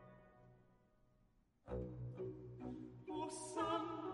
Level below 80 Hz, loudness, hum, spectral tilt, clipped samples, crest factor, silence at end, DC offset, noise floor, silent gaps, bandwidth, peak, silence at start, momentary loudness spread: -64 dBFS; -47 LUFS; none; -5.5 dB/octave; under 0.1%; 20 dB; 0 s; under 0.1%; -76 dBFS; none; 11.5 kHz; -28 dBFS; 0 s; 23 LU